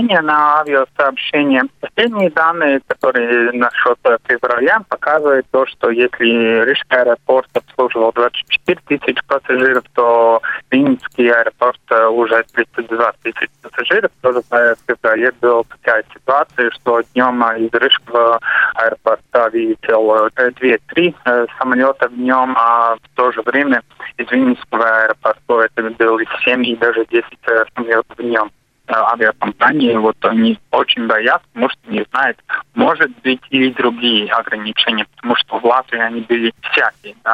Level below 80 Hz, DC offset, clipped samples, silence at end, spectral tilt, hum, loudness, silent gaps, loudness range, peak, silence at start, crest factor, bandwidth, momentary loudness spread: -60 dBFS; under 0.1%; under 0.1%; 0 s; -6 dB/octave; none; -14 LUFS; none; 2 LU; 0 dBFS; 0 s; 14 dB; 8.2 kHz; 5 LU